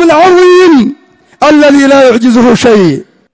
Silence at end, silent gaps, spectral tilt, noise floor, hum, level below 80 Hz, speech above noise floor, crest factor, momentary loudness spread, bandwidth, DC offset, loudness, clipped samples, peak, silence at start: 0.3 s; none; -5.5 dB/octave; -34 dBFS; none; -42 dBFS; 30 dB; 4 dB; 8 LU; 8 kHz; under 0.1%; -5 LUFS; 7%; 0 dBFS; 0 s